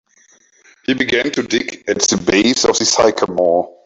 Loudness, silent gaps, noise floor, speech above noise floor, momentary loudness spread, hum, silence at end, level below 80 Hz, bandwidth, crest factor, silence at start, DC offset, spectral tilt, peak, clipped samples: -15 LUFS; none; -53 dBFS; 37 dB; 7 LU; none; 0.15 s; -50 dBFS; 8.4 kHz; 16 dB; 0.9 s; under 0.1%; -2.5 dB/octave; 0 dBFS; under 0.1%